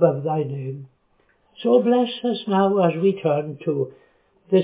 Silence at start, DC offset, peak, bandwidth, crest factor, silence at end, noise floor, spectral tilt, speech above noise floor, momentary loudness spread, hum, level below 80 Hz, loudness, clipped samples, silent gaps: 0 s; under 0.1%; -4 dBFS; 4 kHz; 18 dB; 0 s; -63 dBFS; -11.5 dB/octave; 42 dB; 12 LU; none; -70 dBFS; -21 LUFS; under 0.1%; none